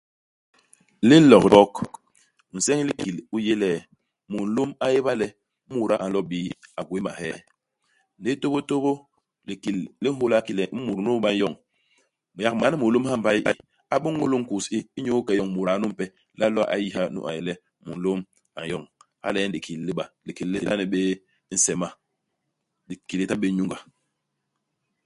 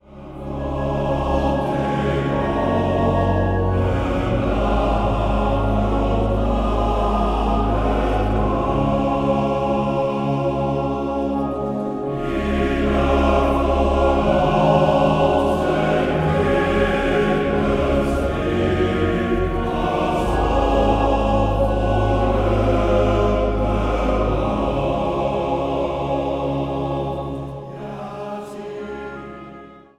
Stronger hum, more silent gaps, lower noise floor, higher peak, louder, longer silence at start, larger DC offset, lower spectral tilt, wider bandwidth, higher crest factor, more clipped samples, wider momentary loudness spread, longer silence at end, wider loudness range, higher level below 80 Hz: neither; neither; first, -79 dBFS vs -41 dBFS; first, 0 dBFS vs -4 dBFS; second, -24 LUFS vs -20 LUFS; first, 1 s vs 0.1 s; neither; second, -5 dB/octave vs -7.5 dB/octave; about the same, 11.5 kHz vs 11 kHz; first, 24 dB vs 14 dB; neither; first, 12 LU vs 8 LU; first, 1.25 s vs 0.2 s; first, 10 LU vs 4 LU; second, -60 dBFS vs -26 dBFS